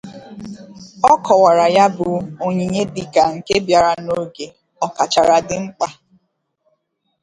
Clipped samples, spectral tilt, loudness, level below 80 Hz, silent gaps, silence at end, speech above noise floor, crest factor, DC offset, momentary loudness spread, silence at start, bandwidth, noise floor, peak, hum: under 0.1%; -4.5 dB/octave; -16 LUFS; -52 dBFS; none; 1.3 s; 53 dB; 18 dB; under 0.1%; 21 LU; 0.05 s; 11.5 kHz; -68 dBFS; 0 dBFS; none